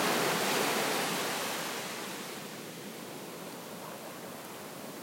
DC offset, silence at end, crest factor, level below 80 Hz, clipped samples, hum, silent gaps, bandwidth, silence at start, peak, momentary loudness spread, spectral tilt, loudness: under 0.1%; 0 s; 18 dB; -80 dBFS; under 0.1%; none; none; 16.5 kHz; 0 s; -16 dBFS; 14 LU; -2.5 dB/octave; -34 LUFS